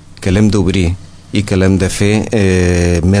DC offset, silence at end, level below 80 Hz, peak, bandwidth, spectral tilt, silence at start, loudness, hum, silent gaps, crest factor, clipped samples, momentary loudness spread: under 0.1%; 0 s; -28 dBFS; 0 dBFS; 11 kHz; -6 dB/octave; 0.1 s; -13 LUFS; none; none; 12 dB; under 0.1%; 7 LU